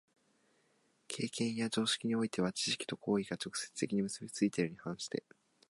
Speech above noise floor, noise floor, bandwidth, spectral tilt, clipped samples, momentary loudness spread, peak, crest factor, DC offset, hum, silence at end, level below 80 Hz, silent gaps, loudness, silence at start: 38 dB; -74 dBFS; 11.5 kHz; -4 dB/octave; under 0.1%; 8 LU; -20 dBFS; 18 dB; under 0.1%; none; 0.5 s; -76 dBFS; none; -36 LUFS; 1.1 s